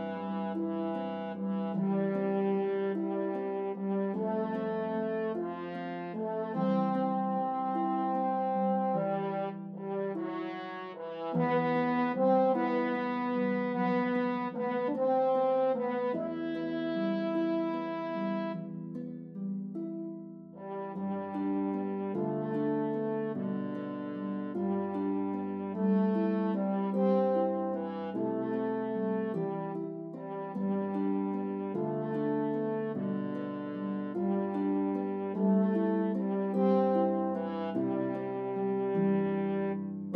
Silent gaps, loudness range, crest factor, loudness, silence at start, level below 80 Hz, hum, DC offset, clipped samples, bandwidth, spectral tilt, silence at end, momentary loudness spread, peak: none; 4 LU; 16 dB; -32 LUFS; 0 s; -82 dBFS; none; under 0.1%; under 0.1%; 5.2 kHz; -10 dB/octave; 0 s; 9 LU; -16 dBFS